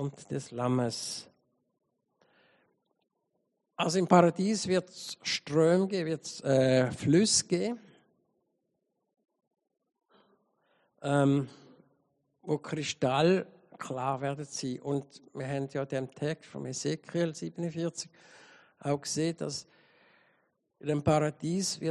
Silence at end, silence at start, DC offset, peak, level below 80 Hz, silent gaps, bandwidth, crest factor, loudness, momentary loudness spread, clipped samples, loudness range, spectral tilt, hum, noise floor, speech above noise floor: 0 s; 0 s; under 0.1%; -8 dBFS; -70 dBFS; none; 11.5 kHz; 24 dB; -30 LUFS; 15 LU; under 0.1%; 9 LU; -5 dB/octave; none; -81 dBFS; 51 dB